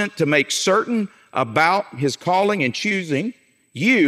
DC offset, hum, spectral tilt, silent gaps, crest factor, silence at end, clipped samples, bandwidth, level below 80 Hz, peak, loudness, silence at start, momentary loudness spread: under 0.1%; none; -4 dB/octave; none; 18 dB; 0 s; under 0.1%; 16 kHz; -70 dBFS; -2 dBFS; -20 LUFS; 0 s; 7 LU